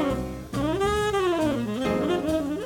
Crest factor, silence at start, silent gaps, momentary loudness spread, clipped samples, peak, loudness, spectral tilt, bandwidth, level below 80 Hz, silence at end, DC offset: 14 dB; 0 s; none; 5 LU; under 0.1%; -12 dBFS; -26 LUFS; -6 dB/octave; 18.5 kHz; -42 dBFS; 0 s; under 0.1%